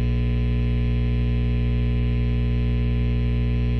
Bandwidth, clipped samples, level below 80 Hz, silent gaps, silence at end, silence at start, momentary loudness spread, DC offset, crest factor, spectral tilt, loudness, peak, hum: 4.5 kHz; under 0.1%; -24 dBFS; none; 0 s; 0 s; 0 LU; under 0.1%; 6 dB; -9.5 dB/octave; -23 LUFS; -14 dBFS; 60 Hz at -20 dBFS